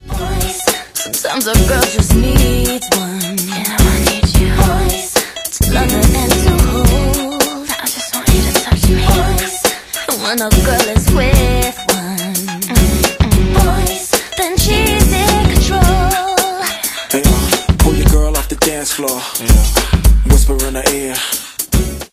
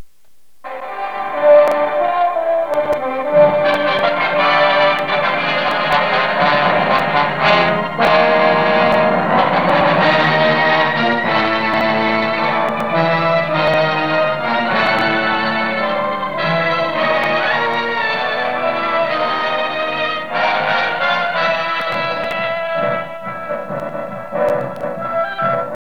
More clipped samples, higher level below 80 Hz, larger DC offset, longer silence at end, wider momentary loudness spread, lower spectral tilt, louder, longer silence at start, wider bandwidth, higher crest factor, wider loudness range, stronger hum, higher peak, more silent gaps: first, 0.2% vs under 0.1%; first, -16 dBFS vs -56 dBFS; second, under 0.1% vs 1%; about the same, 0.05 s vs 0.15 s; about the same, 6 LU vs 8 LU; second, -4 dB/octave vs -6 dB/octave; about the same, -13 LUFS vs -15 LUFS; about the same, 0.05 s vs 0 s; first, 16 kHz vs 11 kHz; about the same, 12 dB vs 16 dB; second, 1 LU vs 5 LU; neither; about the same, 0 dBFS vs 0 dBFS; neither